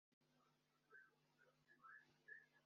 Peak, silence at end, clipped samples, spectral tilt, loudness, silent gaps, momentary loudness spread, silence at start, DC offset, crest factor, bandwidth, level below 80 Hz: -50 dBFS; 0 s; under 0.1%; -1.5 dB/octave; -66 LUFS; 0.13-0.21 s; 6 LU; 0.1 s; under 0.1%; 20 dB; 6.8 kHz; under -90 dBFS